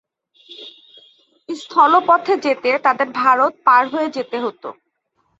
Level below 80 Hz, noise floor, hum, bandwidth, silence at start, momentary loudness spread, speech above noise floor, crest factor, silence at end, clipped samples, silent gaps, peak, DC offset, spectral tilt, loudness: -72 dBFS; -67 dBFS; none; 8 kHz; 0.5 s; 22 LU; 51 dB; 18 dB; 0.65 s; under 0.1%; none; -2 dBFS; under 0.1%; -4 dB/octave; -16 LUFS